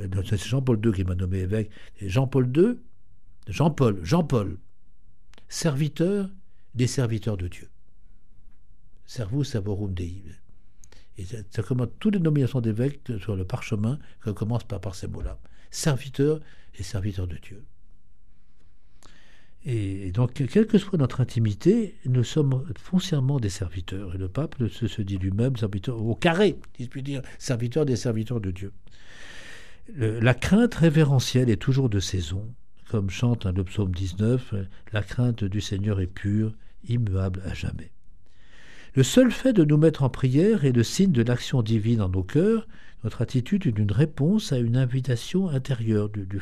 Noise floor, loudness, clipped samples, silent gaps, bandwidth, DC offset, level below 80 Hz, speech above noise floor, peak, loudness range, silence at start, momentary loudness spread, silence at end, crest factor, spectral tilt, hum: -55 dBFS; -25 LUFS; under 0.1%; none; 13.5 kHz; 1%; -46 dBFS; 31 dB; -4 dBFS; 8 LU; 0 s; 14 LU; 0 s; 20 dB; -7 dB/octave; none